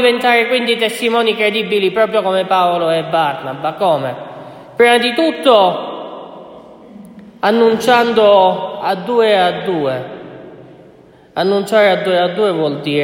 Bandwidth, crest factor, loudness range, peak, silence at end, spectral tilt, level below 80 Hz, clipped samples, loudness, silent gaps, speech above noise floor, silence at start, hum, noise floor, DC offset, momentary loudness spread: 16.5 kHz; 14 dB; 3 LU; 0 dBFS; 0 s; -4.5 dB/octave; -62 dBFS; under 0.1%; -14 LUFS; none; 30 dB; 0 s; none; -43 dBFS; under 0.1%; 16 LU